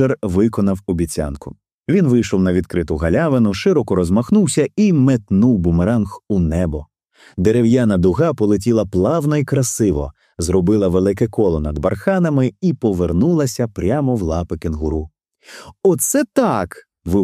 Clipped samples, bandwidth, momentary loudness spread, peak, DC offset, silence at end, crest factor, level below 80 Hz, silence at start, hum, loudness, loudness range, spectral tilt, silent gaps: under 0.1%; 15.5 kHz; 9 LU; -2 dBFS; under 0.1%; 0 s; 14 dB; -34 dBFS; 0 s; none; -17 LUFS; 3 LU; -6.5 dB/octave; 1.74-1.83 s